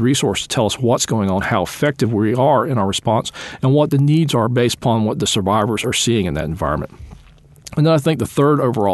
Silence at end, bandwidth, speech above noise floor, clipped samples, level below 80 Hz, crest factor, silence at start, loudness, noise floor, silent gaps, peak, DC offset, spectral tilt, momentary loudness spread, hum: 0 s; 12.5 kHz; 28 dB; under 0.1%; -42 dBFS; 14 dB; 0 s; -17 LUFS; -45 dBFS; none; -2 dBFS; under 0.1%; -5.5 dB/octave; 7 LU; none